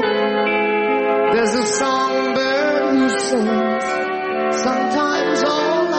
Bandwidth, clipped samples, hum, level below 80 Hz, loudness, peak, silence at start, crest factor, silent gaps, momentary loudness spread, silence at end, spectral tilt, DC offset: 8.8 kHz; under 0.1%; none; -58 dBFS; -18 LUFS; -6 dBFS; 0 s; 10 dB; none; 3 LU; 0 s; -3.5 dB/octave; under 0.1%